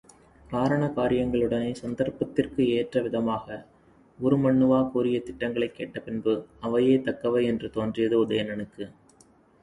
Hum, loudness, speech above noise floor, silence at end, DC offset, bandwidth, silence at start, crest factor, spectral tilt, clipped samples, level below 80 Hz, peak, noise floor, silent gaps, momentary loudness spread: none; -26 LUFS; 33 dB; 0.7 s; under 0.1%; 11 kHz; 0.5 s; 18 dB; -7.5 dB/octave; under 0.1%; -54 dBFS; -8 dBFS; -58 dBFS; none; 11 LU